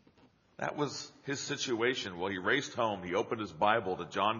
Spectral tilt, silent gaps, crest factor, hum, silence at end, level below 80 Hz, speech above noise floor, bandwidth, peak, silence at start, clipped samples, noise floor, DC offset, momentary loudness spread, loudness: -2.5 dB/octave; none; 22 dB; none; 0 s; -72 dBFS; 32 dB; 7.2 kHz; -12 dBFS; 0.6 s; under 0.1%; -65 dBFS; under 0.1%; 9 LU; -33 LUFS